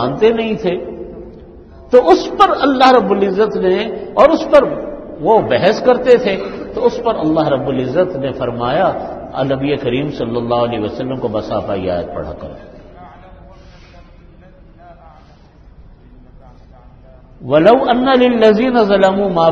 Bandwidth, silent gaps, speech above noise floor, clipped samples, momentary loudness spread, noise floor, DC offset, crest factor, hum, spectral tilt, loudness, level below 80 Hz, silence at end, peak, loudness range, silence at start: 7.6 kHz; none; 29 dB; 0.1%; 14 LU; -42 dBFS; under 0.1%; 14 dB; none; -6.5 dB/octave; -14 LUFS; -42 dBFS; 0 s; 0 dBFS; 11 LU; 0 s